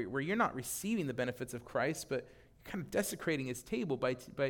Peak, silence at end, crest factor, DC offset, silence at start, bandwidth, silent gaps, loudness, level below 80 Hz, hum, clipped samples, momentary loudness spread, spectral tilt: -18 dBFS; 0 s; 18 dB; under 0.1%; 0 s; 18 kHz; none; -37 LUFS; -64 dBFS; none; under 0.1%; 8 LU; -4.5 dB/octave